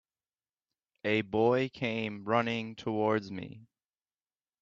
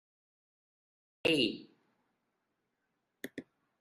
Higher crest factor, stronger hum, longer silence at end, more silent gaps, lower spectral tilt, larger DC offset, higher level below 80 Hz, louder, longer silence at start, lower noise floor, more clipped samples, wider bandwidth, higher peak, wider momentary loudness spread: about the same, 20 dB vs 24 dB; neither; first, 0.95 s vs 0.4 s; neither; first, -7 dB/octave vs -4 dB/octave; neither; about the same, -72 dBFS vs -76 dBFS; about the same, -31 LUFS vs -31 LUFS; second, 1.05 s vs 1.25 s; first, under -90 dBFS vs -83 dBFS; neither; second, 7.6 kHz vs 13 kHz; about the same, -14 dBFS vs -16 dBFS; second, 12 LU vs 20 LU